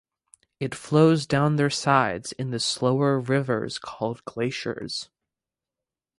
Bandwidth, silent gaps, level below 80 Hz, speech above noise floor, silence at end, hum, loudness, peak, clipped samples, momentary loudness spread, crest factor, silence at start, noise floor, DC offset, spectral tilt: 11.5 kHz; none; -60 dBFS; 65 dB; 1.15 s; none; -24 LUFS; -4 dBFS; under 0.1%; 13 LU; 20 dB; 0.6 s; -89 dBFS; under 0.1%; -5.5 dB/octave